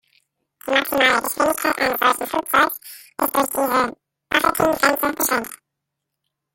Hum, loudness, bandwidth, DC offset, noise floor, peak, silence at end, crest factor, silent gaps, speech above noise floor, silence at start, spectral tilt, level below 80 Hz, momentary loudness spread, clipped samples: none; -19 LUFS; 17 kHz; under 0.1%; -80 dBFS; 0 dBFS; 1 s; 20 dB; none; 61 dB; 0.65 s; -2 dB/octave; -54 dBFS; 8 LU; under 0.1%